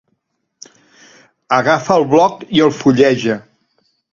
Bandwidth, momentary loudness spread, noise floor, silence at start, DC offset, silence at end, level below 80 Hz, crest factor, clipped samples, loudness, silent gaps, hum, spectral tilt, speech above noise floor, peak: 7.6 kHz; 6 LU; -68 dBFS; 1.5 s; under 0.1%; 0.7 s; -56 dBFS; 16 dB; under 0.1%; -14 LUFS; none; none; -5.5 dB/octave; 56 dB; 0 dBFS